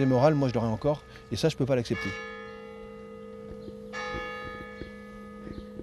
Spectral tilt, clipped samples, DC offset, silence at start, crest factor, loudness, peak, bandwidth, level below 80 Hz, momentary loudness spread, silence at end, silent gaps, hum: -6.5 dB/octave; under 0.1%; under 0.1%; 0 s; 22 dB; -29 LUFS; -8 dBFS; 13 kHz; -52 dBFS; 18 LU; 0 s; none; none